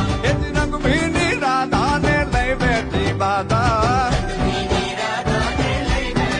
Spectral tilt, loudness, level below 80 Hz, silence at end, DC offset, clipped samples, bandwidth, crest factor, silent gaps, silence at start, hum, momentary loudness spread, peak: -5.5 dB/octave; -19 LUFS; -28 dBFS; 0 s; under 0.1%; under 0.1%; 11 kHz; 14 dB; none; 0 s; none; 4 LU; -4 dBFS